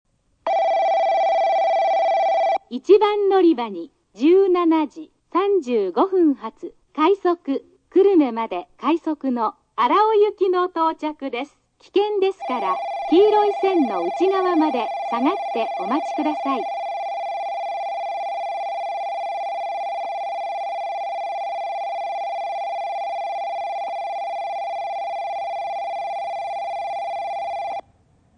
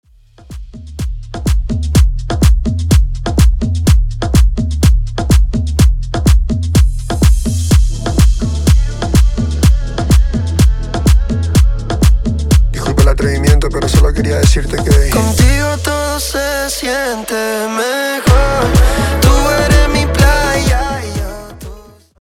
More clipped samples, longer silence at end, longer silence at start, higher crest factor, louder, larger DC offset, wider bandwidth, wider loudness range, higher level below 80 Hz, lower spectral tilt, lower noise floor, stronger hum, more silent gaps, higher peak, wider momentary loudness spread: neither; first, 0.55 s vs 0.4 s; about the same, 0.45 s vs 0.5 s; first, 18 dB vs 12 dB; second, -22 LUFS vs -13 LUFS; second, under 0.1% vs 0.4%; second, 9.4 kHz vs 16.5 kHz; first, 8 LU vs 2 LU; second, -68 dBFS vs -14 dBFS; about the same, -5 dB/octave vs -5.5 dB/octave; first, -58 dBFS vs -37 dBFS; neither; neither; second, -4 dBFS vs 0 dBFS; first, 11 LU vs 6 LU